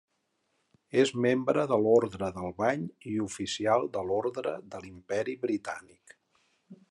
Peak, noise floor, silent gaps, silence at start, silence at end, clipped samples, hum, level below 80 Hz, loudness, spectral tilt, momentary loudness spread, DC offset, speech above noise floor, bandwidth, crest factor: -10 dBFS; -77 dBFS; none; 0.95 s; 0.15 s; under 0.1%; none; -78 dBFS; -29 LUFS; -5.5 dB/octave; 11 LU; under 0.1%; 48 dB; 11.5 kHz; 20 dB